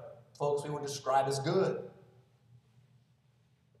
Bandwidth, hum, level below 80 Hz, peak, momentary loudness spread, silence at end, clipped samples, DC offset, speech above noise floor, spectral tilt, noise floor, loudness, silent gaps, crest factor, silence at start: 14 kHz; none; -78 dBFS; -18 dBFS; 14 LU; 1.85 s; under 0.1%; under 0.1%; 37 dB; -5.5 dB/octave; -69 dBFS; -33 LUFS; none; 18 dB; 0 s